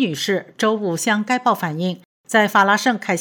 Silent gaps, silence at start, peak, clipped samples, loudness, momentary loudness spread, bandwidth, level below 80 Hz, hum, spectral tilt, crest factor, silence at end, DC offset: 2.05-2.24 s; 0 s; -2 dBFS; under 0.1%; -19 LUFS; 9 LU; over 20 kHz; -74 dBFS; none; -4 dB/octave; 16 dB; 0 s; under 0.1%